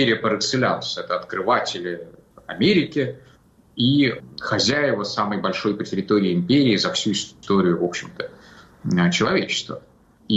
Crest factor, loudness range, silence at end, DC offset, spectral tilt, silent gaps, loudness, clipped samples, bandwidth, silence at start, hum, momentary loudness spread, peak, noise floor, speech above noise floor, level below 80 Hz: 14 dB; 2 LU; 0 s; under 0.1%; -5 dB/octave; none; -21 LUFS; under 0.1%; 8.2 kHz; 0 s; none; 15 LU; -8 dBFS; -53 dBFS; 32 dB; -58 dBFS